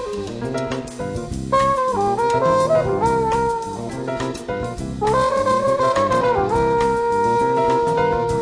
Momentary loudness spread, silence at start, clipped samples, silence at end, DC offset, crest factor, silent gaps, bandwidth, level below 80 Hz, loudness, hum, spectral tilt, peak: 10 LU; 0 s; under 0.1%; 0 s; under 0.1%; 14 dB; none; 10.5 kHz; -40 dBFS; -19 LUFS; none; -6 dB/octave; -6 dBFS